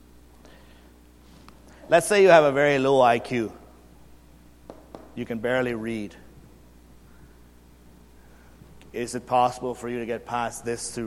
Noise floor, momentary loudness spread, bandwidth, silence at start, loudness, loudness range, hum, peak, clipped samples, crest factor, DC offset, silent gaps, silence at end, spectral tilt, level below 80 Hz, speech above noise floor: -52 dBFS; 20 LU; 15 kHz; 1.85 s; -23 LUFS; 13 LU; 60 Hz at -50 dBFS; -2 dBFS; under 0.1%; 24 dB; under 0.1%; none; 0 s; -4.5 dB/octave; -54 dBFS; 29 dB